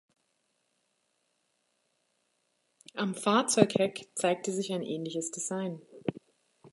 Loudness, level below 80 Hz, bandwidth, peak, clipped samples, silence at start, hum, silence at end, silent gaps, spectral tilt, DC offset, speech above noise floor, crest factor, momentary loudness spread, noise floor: -31 LUFS; -76 dBFS; 11.5 kHz; -4 dBFS; under 0.1%; 2.95 s; none; 0.05 s; none; -4 dB/octave; under 0.1%; 47 dB; 28 dB; 13 LU; -77 dBFS